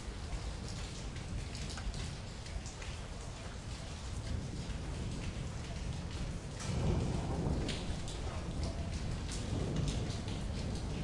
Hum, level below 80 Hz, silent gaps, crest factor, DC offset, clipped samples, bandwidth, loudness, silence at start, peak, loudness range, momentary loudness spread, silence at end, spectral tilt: none; -44 dBFS; none; 18 dB; under 0.1%; under 0.1%; 11.5 kHz; -41 LUFS; 0 s; -20 dBFS; 5 LU; 8 LU; 0 s; -5.5 dB/octave